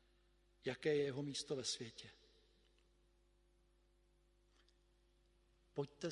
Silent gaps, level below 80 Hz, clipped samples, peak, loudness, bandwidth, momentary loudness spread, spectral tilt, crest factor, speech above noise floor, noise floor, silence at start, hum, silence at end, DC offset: none; -76 dBFS; under 0.1%; -26 dBFS; -44 LUFS; 11.5 kHz; 14 LU; -4 dB/octave; 22 dB; 32 dB; -75 dBFS; 0.65 s; 50 Hz at -75 dBFS; 0 s; under 0.1%